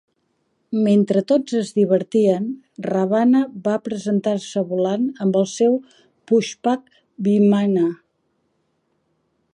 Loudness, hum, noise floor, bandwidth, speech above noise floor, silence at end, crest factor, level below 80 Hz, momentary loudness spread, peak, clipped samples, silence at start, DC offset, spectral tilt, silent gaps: -19 LUFS; none; -69 dBFS; 10.5 kHz; 50 dB; 1.6 s; 16 dB; -70 dBFS; 8 LU; -4 dBFS; under 0.1%; 0.7 s; under 0.1%; -7 dB/octave; none